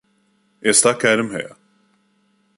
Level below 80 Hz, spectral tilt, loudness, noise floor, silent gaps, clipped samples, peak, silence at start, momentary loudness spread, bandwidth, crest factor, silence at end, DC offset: -64 dBFS; -2 dB/octave; -16 LUFS; -63 dBFS; none; under 0.1%; 0 dBFS; 0.65 s; 16 LU; 11.5 kHz; 22 dB; 1.1 s; under 0.1%